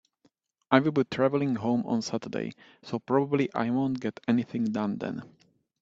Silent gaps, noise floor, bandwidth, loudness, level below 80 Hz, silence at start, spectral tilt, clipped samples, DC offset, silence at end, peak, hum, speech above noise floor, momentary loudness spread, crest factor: none; -70 dBFS; 7.8 kHz; -28 LUFS; -68 dBFS; 0.7 s; -7 dB/octave; under 0.1%; under 0.1%; 0.55 s; -2 dBFS; none; 42 dB; 12 LU; 26 dB